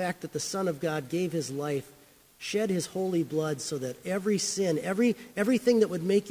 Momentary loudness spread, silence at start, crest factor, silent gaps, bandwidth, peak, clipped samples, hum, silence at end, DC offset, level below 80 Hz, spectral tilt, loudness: 8 LU; 0 s; 18 dB; none; 16 kHz; -12 dBFS; under 0.1%; none; 0 s; under 0.1%; -70 dBFS; -5 dB/octave; -29 LUFS